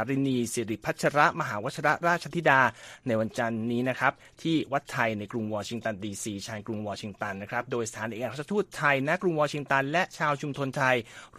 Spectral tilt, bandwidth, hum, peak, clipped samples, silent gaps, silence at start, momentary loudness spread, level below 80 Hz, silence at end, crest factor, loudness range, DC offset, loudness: -5 dB/octave; 15 kHz; none; -6 dBFS; under 0.1%; none; 0 s; 11 LU; -64 dBFS; 0 s; 22 dB; 6 LU; under 0.1%; -28 LUFS